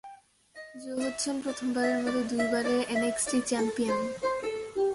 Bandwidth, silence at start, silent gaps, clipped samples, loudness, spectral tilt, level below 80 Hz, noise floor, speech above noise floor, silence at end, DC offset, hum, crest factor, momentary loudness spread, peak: 11.5 kHz; 0.05 s; none; under 0.1%; -29 LUFS; -3 dB/octave; -64 dBFS; -53 dBFS; 24 dB; 0 s; under 0.1%; none; 14 dB; 6 LU; -16 dBFS